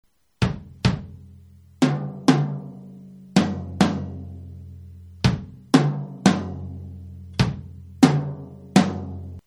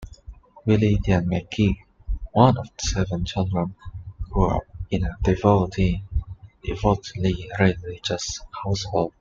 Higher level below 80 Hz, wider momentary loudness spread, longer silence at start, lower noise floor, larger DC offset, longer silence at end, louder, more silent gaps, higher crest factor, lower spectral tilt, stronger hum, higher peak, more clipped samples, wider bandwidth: second, -44 dBFS vs -34 dBFS; first, 21 LU vs 14 LU; first, 0.4 s vs 0 s; first, -48 dBFS vs -44 dBFS; neither; about the same, 0.05 s vs 0.1 s; about the same, -23 LUFS vs -23 LUFS; neither; about the same, 24 dB vs 20 dB; about the same, -6 dB/octave vs -6 dB/octave; neither; about the same, 0 dBFS vs -2 dBFS; neither; first, 13 kHz vs 7.6 kHz